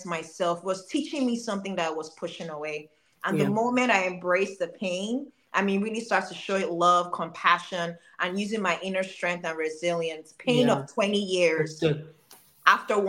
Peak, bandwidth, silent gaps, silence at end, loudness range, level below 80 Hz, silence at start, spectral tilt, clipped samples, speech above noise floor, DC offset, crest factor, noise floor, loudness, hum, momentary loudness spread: -2 dBFS; 17 kHz; none; 0 s; 3 LU; -74 dBFS; 0 s; -4.5 dB/octave; under 0.1%; 28 dB; under 0.1%; 24 dB; -55 dBFS; -27 LUFS; none; 12 LU